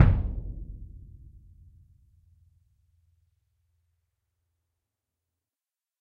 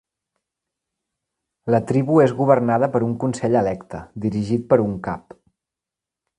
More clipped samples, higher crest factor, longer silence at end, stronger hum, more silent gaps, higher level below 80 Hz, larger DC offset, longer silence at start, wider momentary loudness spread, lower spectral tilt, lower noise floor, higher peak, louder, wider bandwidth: neither; first, 30 dB vs 20 dB; first, 5 s vs 1.2 s; neither; neither; first, -38 dBFS vs -52 dBFS; neither; second, 0 s vs 1.65 s; first, 27 LU vs 14 LU; first, -10 dB/octave vs -8 dB/octave; about the same, under -90 dBFS vs -87 dBFS; about the same, -2 dBFS vs 0 dBFS; second, -31 LUFS vs -20 LUFS; second, 4.2 kHz vs 11 kHz